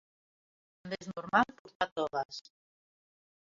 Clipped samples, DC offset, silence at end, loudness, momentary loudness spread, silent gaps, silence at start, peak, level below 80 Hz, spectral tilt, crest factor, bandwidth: under 0.1%; under 0.1%; 1 s; -34 LUFS; 14 LU; 1.59-1.65 s, 1.75-1.80 s, 1.91-1.96 s, 2.25-2.29 s; 0.85 s; -12 dBFS; -72 dBFS; -2.5 dB/octave; 26 dB; 7.6 kHz